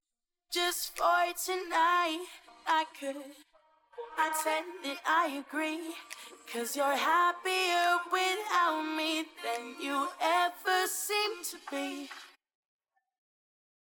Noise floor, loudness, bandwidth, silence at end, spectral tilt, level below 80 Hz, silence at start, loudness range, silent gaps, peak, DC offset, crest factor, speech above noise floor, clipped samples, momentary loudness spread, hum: -87 dBFS; -31 LUFS; 19 kHz; 1.55 s; 0.5 dB/octave; -76 dBFS; 0.5 s; 5 LU; none; -16 dBFS; under 0.1%; 16 dB; 56 dB; under 0.1%; 14 LU; none